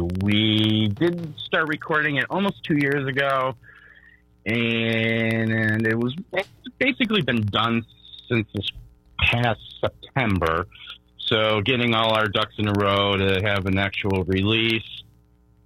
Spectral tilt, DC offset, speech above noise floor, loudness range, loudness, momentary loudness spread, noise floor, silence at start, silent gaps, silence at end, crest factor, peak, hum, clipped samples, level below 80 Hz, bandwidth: -6.5 dB/octave; under 0.1%; 34 dB; 3 LU; -22 LUFS; 10 LU; -57 dBFS; 0 s; none; 0.65 s; 18 dB; -6 dBFS; none; under 0.1%; -48 dBFS; 13.5 kHz